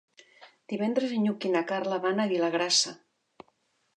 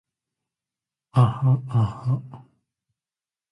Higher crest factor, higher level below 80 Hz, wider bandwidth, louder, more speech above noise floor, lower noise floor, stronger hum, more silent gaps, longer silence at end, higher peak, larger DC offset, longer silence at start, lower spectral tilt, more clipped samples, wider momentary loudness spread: about the same, 18 dB vs 20 dB; second, -84 dBFS vs -54 dBFS; first, 11 kHz vs 5.4 kHz; second, -27 LUFS vs -23 LUFS; second, 44 dB vs over 69 dB; second, -71 dBFS vs under -90 dBFS; neither; neither; second, 1 s vs 1.15 s; second, -12 dBFS vs -6 dBFS; neither; second, 0.4 s vs 1.15 s; second, -3 dB/octave vs -9 dB/octave; neither; about the same, 7 LU vs 8 LU